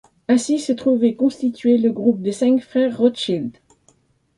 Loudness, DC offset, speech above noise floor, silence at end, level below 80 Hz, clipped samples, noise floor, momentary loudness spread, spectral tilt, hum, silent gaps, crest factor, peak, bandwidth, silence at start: -19 LUFS; under 0.1%; 41 dB; 0.85 s; -64 dBFS; under 0.1%; -59 dBFS; 5 LU; -5.5 dB/octave; none; none; 16 dB; -4 dBFS; 11.5 kHz; 0.3 s